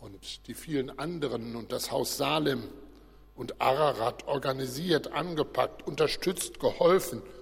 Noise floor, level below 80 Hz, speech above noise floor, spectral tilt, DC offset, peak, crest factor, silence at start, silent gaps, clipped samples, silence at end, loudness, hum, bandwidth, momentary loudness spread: -53 dBFS; -56 dBFS; 24 dB; -4.5 dB/octave; under 0.1%; -10 dBFS; 20 dB; 0 s; none; under 0.1%; 0 s; -30 LUFS; none; 16.5 kHz; 13 LU